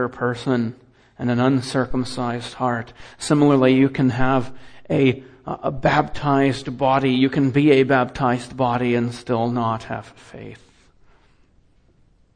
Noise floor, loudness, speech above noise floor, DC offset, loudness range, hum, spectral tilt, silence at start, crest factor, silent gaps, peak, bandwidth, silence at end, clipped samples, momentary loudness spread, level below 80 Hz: -56 dBFS; -20 LUFS; 37 dB; under 0.1%; 6 LU; none; -6.5 dB/octave; 0 s; 18 dB; none; -4 dBFS; 10 kHz; 1.8 s; under 0.1%; 16 LU; -46 dBFS